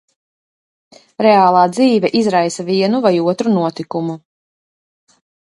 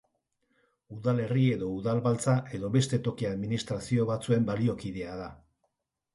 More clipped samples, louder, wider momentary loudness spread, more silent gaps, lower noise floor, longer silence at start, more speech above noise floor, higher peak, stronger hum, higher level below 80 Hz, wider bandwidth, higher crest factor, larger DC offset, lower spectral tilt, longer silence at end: neither; first, -14 LUFS vs -29 LUFS; about the same, 12 LU vs 11 LU; neither; first, under -90 dBFS vs -79 dBFS; first, 1.2 s vs 0.9 s; first, over 76 dB vs 51 dB; first, 0 dBFS vs -14 dBFS; neither; second, -64 dBFS vs -58 dBFS; about the same, 11.5 kHz vs 11.5 kHz; about the same, 16 dB vs 16 dB; neither; about the same, -6 dB/octave vs -6.5 dB/octave; first, 1.45 s vs 0.8 s